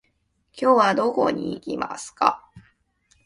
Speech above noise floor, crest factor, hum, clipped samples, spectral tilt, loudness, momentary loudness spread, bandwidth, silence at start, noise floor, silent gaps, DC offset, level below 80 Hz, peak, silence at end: 47 dB; 22 dB; none; under 0.1%; -4.5 dB/octave; -22 LUFS; 12 LU; 11.5 kHz; 0.55 s; -69 dBFS; none; under 0.1%; -62 dBFS; -2 dBFS; 0.65 s